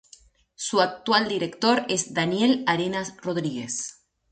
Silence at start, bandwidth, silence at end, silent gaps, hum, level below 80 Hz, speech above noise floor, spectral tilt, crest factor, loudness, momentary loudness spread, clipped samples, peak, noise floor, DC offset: 0.6 s; 9.4 kHz; 0.4 s; none; none; -64 dBFS; 31 dB; -3.5 dB/octave; 18 dB; -24 LUFS; 9 LU; under 0.1%; -6 dBFS; -55 dBFS; under 0.1%